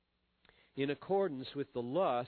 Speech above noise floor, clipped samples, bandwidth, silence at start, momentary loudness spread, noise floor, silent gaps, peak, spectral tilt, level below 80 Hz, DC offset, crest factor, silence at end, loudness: 37 dB; under 0.1%; 4.5 kHz; 0.75 s; 7 LU; -72 dBFS; none; -22 dBFS; -5 dB/octave; -76 dBFS; under 0.1%; 16 dB; 0 s; -37 LUFS